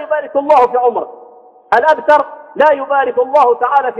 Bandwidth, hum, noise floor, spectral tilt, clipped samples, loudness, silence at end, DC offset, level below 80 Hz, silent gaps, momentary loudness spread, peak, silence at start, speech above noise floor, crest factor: 7.8 kHz; none; -41 dBFS; -4.5 dB/octave; under 0.1%; -12 LUFS; 0 s; under 0.1%; -60 dBFS; none; 6 LU; 0 dBFS; 0 s; 29 dB; 12 dB